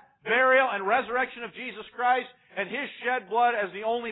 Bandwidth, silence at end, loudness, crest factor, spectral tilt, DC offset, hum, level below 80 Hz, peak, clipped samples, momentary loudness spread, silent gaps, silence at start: 4.1 kHz; 0 s; -26 LUFS; 16 dB; -7.5 dB/octave; under 0.1%; none; -72 dBFS; -10 dBFS; under 0.1%; 15 LU; none; 0.25 s